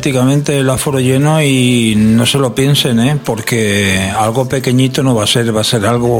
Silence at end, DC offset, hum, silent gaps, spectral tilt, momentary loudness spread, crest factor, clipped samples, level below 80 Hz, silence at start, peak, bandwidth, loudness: 0 s; under 0.1%; none; none; -5 dB/octave; 3 LU; 12 dB; under 0.1%; -40 dBFS; 0 s; 0 dBFS; 17 kHz; -11 LUFS